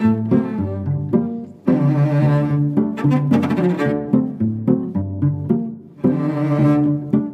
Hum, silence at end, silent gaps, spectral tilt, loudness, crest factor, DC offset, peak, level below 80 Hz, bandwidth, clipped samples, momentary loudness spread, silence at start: none; 0 s; none; -10 dB/octave; -18 LUFS; 16 dB; under 0.1%; -2 dBFS; -52 dBFS; 6 kHz; under 0.1%; 7 LU; 0 s